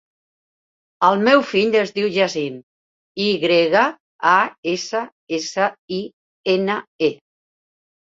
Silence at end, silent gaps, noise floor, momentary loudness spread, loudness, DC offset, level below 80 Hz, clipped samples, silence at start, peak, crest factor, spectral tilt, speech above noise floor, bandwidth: 0.95 s; 2.63-3.15 s, 4.00-4.19 s, 4.58-4.63 s, 5.12-5.27 s, 5.78-5.88 s, 6.13-6.44 s, 6.87-6.99 s; under -90 dBFS; 13 LU; -19 LUFS; under 0.1%; -66 dBFS; under 0.1%; 1 s; -2 dBFS; 20 dB; -4.5 dB/octave; over 72 dB; 7.8 kHz